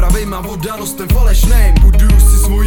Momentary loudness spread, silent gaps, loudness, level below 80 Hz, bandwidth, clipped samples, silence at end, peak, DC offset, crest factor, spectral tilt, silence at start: 11 LU; none; -13 LUFS; -8 dBFS; 18 kHz; 0.3%; 0 s; 0 dBFS; under 0.1%; 8 dB; -5.5 dB/octave; 0 s